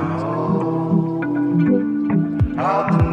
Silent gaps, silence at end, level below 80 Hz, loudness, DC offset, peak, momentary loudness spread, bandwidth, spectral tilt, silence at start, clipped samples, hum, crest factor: none; 0 s; -36 dBFS; -19 LUFS; under 0.1%; -4 dBFS; 4 LU; 6 kHz; -10 dB/octave; 0 s; under 0.1%; none; 14 dB